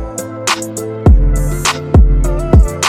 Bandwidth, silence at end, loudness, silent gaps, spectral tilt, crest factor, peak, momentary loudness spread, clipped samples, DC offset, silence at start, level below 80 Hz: 15 kHz; 0 s; -13 LUFS; none; -5 dB/octave; 10 dB; 0 dBFS; 8 LU; under 0.1%; under 0.1%; 0 s; -12 dBFS